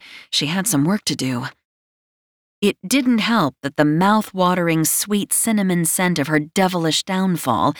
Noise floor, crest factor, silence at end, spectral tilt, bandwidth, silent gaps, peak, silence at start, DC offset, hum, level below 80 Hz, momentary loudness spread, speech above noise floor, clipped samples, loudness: under -90 dBFS; 16 dB; 0 s; -4 dB/octave; over 20 kHz; 1.65-2.62 s; -4 dBFS; 0.05 s; under 0.1%; none; -60 dBFS; 5 LU; over 72 dB; under 0.1%; -18 LUFS